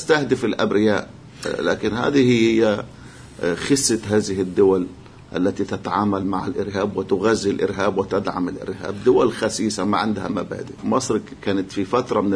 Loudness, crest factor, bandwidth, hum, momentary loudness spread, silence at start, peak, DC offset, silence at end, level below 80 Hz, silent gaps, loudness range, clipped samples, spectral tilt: -21 LUFS; 16 dB; 11 kHz; none; 10 LU; 0 s; -4 dBFS; under 0.1%; 0 s; -50 dBFS; none; 3 LU; under 0.1%; -5 dB/octave